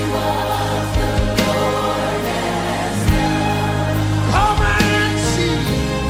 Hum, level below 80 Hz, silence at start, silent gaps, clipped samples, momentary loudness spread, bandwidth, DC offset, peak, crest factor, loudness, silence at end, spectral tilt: none; -26 dBFS; 0 s; none; under 0.1%; 5 LU; 16.5 kHz; under 0.1%; -2 dBFS; 16 dB; -18 LUFS; 0 s; -5 dB/octave